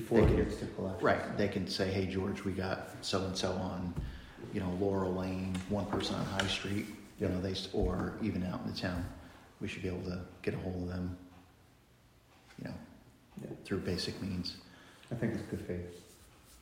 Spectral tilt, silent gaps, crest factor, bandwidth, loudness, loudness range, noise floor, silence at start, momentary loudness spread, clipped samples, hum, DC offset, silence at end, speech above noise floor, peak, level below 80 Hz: -6 dB/octave; none; 24 dB; 16 kHz; -36 LUFS; 8 LU; -64 dBFS; 0 s; 14 LU; under 0.1%; none; under 0.1%; 0 s; 29 dB; -12 dBFS; -50 dBFS